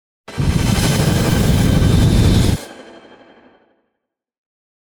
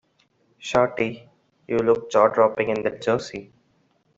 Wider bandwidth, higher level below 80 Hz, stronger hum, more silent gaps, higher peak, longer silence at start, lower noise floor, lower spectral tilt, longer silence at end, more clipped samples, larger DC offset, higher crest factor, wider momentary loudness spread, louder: first, over 20 kHz vs 8 kHz; first, -24 dBFS vs -60 dBFS; neither; neither; about the same, -2 dBFS vs -4 dBFS; second, 0.3 s vs 0.6 s; first, -77 dBFS vs -65 dBFS; about the same, -5.5 dB/octave vs -5.5 dB/octave; first, 2.15 s vs 0.75 s; neither; neither; second, 14 dB vs 20 dB; second, 10 LU vs 18 LU; first, -15 LUFS vs -22 LUFS